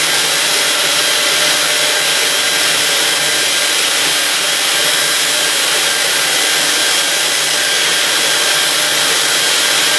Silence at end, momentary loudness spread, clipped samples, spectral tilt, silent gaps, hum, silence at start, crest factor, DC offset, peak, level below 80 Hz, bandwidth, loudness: 0 s; 1 LU; under 0.1%; 1 dB/octave; none; none; 0 s; 14 dB; under 0.1%; 0 dBFS; -62 dBFS; 12 kHz; -11 LUFS